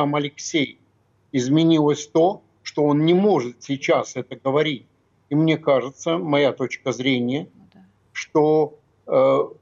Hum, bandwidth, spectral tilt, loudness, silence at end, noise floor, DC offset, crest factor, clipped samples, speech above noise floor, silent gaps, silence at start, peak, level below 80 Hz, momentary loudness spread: none; 7.6 kHz; -6 dB/octave; -21 LUFS; 0.1 s; -62 dBFS; under 0.1%; 14 dB; under 0.1%; 42 dB; none; 0 s; -6 dBFS; -70 dBFS; 11 LU